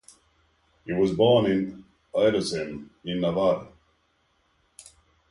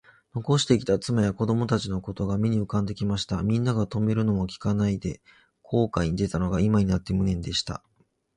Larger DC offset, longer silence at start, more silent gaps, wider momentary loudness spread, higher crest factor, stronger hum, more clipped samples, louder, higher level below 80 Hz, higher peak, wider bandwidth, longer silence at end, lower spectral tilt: neither; first, 0.85 s vs 0.35 s; neither; first, 15 LU vs 8 LU; about the same, 18 dB vs 18 dB; neither; neither; about the same, -25 LUFS vs -26 LUFS; second, -56 dBFS vs -44 dBFS; about the same, -8 dBFS vs -6 dBFS; about the same, 11.5 kHz vs 11 kHz; first, 1.65 s vs 0.6 s; about the same, -6 dB/octave vs -6.5 dB/octave